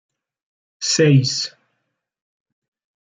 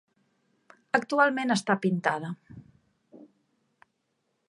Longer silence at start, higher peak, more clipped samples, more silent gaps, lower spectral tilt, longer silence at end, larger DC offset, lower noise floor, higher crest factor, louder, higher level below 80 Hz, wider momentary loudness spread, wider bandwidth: second, 0.8 s vs 0.95 s; about the same, -4 dBFS vs -4 dBFS; neither; neither; about the same, -4.5 dB/octave vs -5 dB/octave; first, 1.6 s vs 1.25 s; neither; about the same, -75 dBFS vs -77 dBFS; second, 18 dB vs 26 dB; first, -17 LUFS vs -26 LUFS; first, -66 dBFS vs -74 dBFS; about the same, 12 LU vs 12 LU; second, 9.4 kHz vs 11.5 kHz